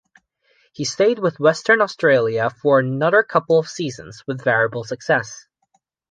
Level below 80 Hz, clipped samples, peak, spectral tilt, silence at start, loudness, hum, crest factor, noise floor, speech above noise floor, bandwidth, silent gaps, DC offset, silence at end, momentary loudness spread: -64 dBFS; under 0.1%; -2 dBFS; -5 dB/octave; 0.8 s; -18 LUFS; none; 18 dB; -67 dBFS; 48 dB; 9.6 kHz; none; under 0.1%; 0.75 s; 11 LU